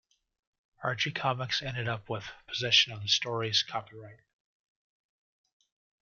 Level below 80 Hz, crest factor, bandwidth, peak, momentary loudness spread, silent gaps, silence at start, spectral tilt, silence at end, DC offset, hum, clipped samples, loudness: -66 dBFS; 24 dB; 7.4 kHz; -10 dBFS; 15 LU; none; 0.8 s; -2.5 dB/octave; 1.85 s; under 0.1%; none; under 0.1%; -29 LUFS